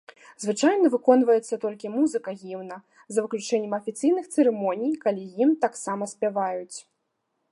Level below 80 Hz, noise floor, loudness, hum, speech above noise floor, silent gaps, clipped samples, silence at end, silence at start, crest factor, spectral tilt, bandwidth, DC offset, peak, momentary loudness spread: -80 dBFS; -77 dBFS; -24 LUFS; none; 53 dB; none; under 0.1%; 0.7 s; 0.3 s; 20 dB; -5 dB/octave; 11.5 kHz; under 0.1%; -6 dBFS; 16 LU